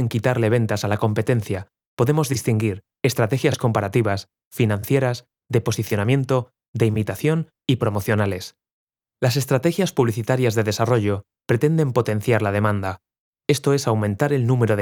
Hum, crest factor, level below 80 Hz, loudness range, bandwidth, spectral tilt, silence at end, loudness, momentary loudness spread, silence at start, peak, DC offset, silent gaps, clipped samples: none; 18 dB; -60 dBFS; 2 LU; 20 kHz; -6.5 dB/octave; 0 s; -21 LUFS; 7 LU; 0 s; -4 dBFS; under 0.1%; 1.87-1.97 s, 4.45-4.51 s, 6.68-6.74 s, 8.73-8.87 s, 13.20-13.33 s; under 0.1%